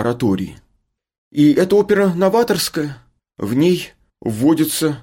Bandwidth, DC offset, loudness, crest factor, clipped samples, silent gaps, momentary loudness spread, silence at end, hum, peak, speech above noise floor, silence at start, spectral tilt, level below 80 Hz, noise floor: 17 kHz; under 0.1%; -16 LUFS; 14 dB; under 0.1%; 1.18-1.31 s; 14 LU; 0 s; none; -4 dBFS; 50 dB; 0 s; -5.5 dB/octave; -52 dBFS; -66 dBFS